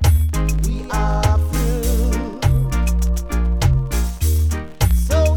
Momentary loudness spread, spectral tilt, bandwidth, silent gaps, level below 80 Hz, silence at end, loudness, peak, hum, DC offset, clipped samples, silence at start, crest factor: 4 LU; -6 dB/octave; 19 kHz; none; -18 dBFS; 0 s; -19 LUFS; -4 dBFS; none; under 0.1%; under 0.1%; 0 s; 12 dB